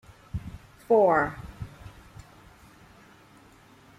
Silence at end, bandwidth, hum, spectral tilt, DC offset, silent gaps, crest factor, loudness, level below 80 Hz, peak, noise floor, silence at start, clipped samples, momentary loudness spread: 2.1 s; 14.5 kHz; none; -7.5 dB/octave; under 0.1%; none; 20 dB; -25 LUFS; -52 dBFS; -10 dBFS; -55 dBFS; 0.35 s; under 0.1%; 28 LU